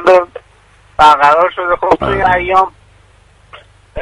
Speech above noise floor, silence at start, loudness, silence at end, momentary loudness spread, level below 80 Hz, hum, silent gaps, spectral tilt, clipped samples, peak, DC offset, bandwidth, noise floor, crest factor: 36 dB; 0 s; -11 LUFS; 0 s; 16 LU; -36 dBFS; none; none; -5 dB/octave; 0.2%; 0 dBFS; under 0.1%; 11.5 kHz; -46 dBFS; 12 dB